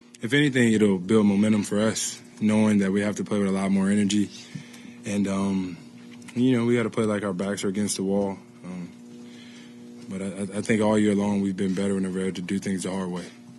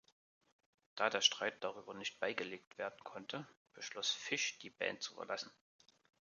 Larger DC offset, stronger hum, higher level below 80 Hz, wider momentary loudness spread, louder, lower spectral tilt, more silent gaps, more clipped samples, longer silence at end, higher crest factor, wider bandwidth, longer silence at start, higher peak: neither; neither; first, -64 dBFS vs -88 dBFS; first, 20 LU vs 16 LU; first, -24 LUFS vs -40 LUFS; first, -5.5 dB/octave vs -1 dB/octave; second, none vs 2.67-2.71 s, 3.57-3.65 s; neither; second, 0 s vs 0.8 s; second, 16 dB vs 28 dB; first, 12.5 kHz vs 10 kHz; second, 0.2 s vs 0.95 s; first, -8 dBFS vs -16 dBFS